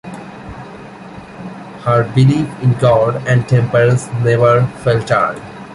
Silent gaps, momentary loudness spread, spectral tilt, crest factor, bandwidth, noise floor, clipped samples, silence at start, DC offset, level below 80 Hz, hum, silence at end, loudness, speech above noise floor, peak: none; 20 LU; -7.5 dB/octave; 14 dB; 11 kHz; -33 dBFS; under 0.1%; 0.05 s; under 0.1%; -44 dBFS; none; 0 s; -14 LUFS; 20 dB; -2 dBFS